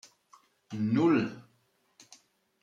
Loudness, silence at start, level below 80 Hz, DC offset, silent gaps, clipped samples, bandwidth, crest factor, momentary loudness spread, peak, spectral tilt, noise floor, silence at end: -28 LUFS; 0.7 s; -76 dBFS; under 0.1%; none; under 0.1%; 9.2 kHz; 18 dB; 19 LU; -16 dBFS; -7.5 dB/octave; -71 dBFS; 1.2 s